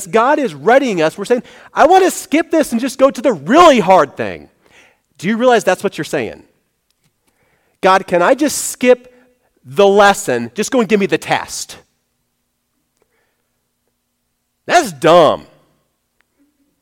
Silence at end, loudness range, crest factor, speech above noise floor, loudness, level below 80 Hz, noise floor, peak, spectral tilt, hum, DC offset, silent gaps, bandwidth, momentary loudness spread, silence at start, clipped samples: 1.4 s; 8 LU; 14 dB; 56 dB; -13 LUFS; -52 dBFS; -68 dBFS; 0 dBFS; -4 dB/octave; none; under 0.1%; none; 17.5 kHz; 14 LU; 0 s; under 0.1%